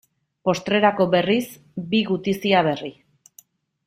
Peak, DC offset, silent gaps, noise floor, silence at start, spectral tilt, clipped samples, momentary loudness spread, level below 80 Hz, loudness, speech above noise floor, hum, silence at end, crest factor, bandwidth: -4 dBFS; under 0.1%; none; -54 dBFS; 0.45 s; -5.5 dB/octave; under 0.1%; 13 LU; -62 dBFS; -21 LUFS; 34 dB; none; 0.95 s; 18 dB; 16 kHz